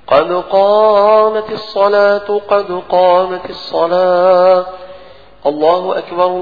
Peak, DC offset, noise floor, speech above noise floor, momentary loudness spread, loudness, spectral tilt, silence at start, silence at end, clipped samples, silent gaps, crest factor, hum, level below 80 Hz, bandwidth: 0 dBFS; 0.7%; -38 dBFS; 27 dB; 11 LU; -12 LUFS; -6.5 dB/octave; 0.1 s; 0 s; under 0.1%; none; 12 dB; none; -52 dBFS; 5 kHz